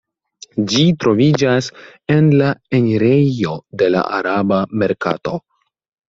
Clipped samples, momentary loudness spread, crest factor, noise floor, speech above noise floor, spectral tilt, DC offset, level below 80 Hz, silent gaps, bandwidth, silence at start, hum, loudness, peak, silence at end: under 0.1%; 10 LU; 14 dB; -44 dBFS; 29 dB; -6.5 dB/octave; under 0.1%; -54 dBFS; none; 7.8 kHz; 0.55 s; none; -16 LUFS; -2 dBFS; 0.7 s